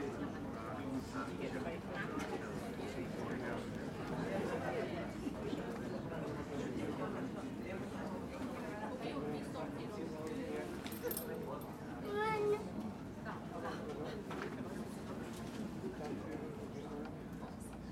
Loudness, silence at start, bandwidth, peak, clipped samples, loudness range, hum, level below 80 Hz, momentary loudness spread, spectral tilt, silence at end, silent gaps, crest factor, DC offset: -43 LUFS; 0 s; 16.5 kHz; -26 dBFS; under 0.1%; 4 LU; none; -62 dBFS; 6 LU; -6 dB/octave; 0 s; none; 16 dB; under 0.1%